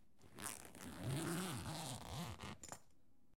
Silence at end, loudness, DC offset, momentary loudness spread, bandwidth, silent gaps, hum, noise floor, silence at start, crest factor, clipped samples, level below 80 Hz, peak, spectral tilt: 0 s; -48 LUFS; under 0.1%; 12 LU; 17 kHz; none; none; -76 dBFS; 0.2 s; 26 dB; under 0.1%; -68 dBFS; -24 dBFS; -4 dB/octave